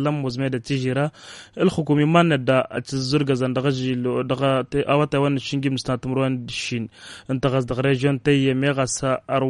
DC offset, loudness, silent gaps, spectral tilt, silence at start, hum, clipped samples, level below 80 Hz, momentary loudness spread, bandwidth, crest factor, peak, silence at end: under 0.1%; -22 LUFS; none; -6 dB/octave; 0 s; none; under 0.1%; -52 dBFS; 8 LU; 11.5 kHz; 18 dB; -4 dBFS; 0 s